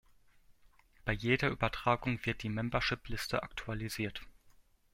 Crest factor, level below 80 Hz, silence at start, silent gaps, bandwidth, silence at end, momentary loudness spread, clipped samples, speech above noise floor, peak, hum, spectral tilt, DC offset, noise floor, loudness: 20 dB; -52 dBFS; 0.65 s; none; 16.5 kHz; 0.45 s; 9 LU; under 0.1%; 29 dB; -16 dBFS; none; -5.5 dB/octave; under 0.1%; -64 dBFS; -35 LUFS